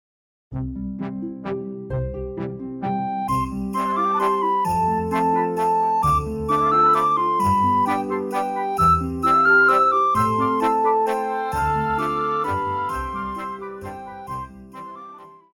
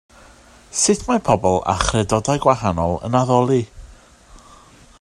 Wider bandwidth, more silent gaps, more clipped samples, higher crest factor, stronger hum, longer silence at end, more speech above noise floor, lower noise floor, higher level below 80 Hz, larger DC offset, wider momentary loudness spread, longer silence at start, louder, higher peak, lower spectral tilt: first, 19 kHz vs 12.5 kHz; neither; neither; about the same, 16 dB vs 20 dB; neither; second, 0.2 s vs 0.65 s; second, 14 dB vs 29 dB; second, -42 dBFS vs -47 dBFS; about the same, -42 dBFS vs -38 dBFS; neither; first, 16 LU vs 5 LU; second, 0.5 s vs 0.75 s; second, -21 LUFS vs -18 LUFS; second, -6 dBFS vs 0 dBFS; first, -6.5 dB/octave vs -5 dB/octave